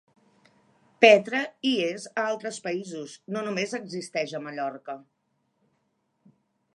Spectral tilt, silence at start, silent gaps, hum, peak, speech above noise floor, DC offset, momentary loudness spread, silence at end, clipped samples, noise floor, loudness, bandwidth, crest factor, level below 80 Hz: -4 dB/octave; 1 s; none; none; -2 dBFS; 48 dB; under 0.1%; 20 LU; 1.75 s; under 0.1%; -74 dBFS; -25 LUFS; 11.5 kHz; 26 dB; -84 dBFS